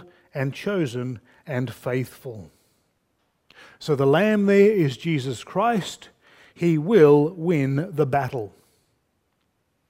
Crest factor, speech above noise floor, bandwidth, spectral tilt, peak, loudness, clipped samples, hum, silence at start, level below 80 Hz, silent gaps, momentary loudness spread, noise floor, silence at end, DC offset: 20 dB; 50 dB; 16 kHz; -7 dB/octave; -4 dBFS; -22 LUFS; under 0.1%; none; 0.35 s; -64 dBFS; none; 19 LU; -71 dBFS; 1.4 s; under 0.1%